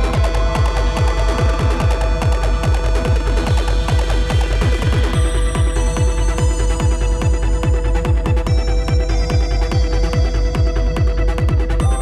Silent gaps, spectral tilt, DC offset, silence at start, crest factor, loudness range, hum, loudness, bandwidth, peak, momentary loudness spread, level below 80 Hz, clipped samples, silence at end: none; -6 dB/octave; under 0.1%; 0 s; 10 dB; 0 LU; none; -18 LUFS; 11.5 kHz; -4 dBFS; 1 LU; -16 dBFS; under 0.1%; 0 s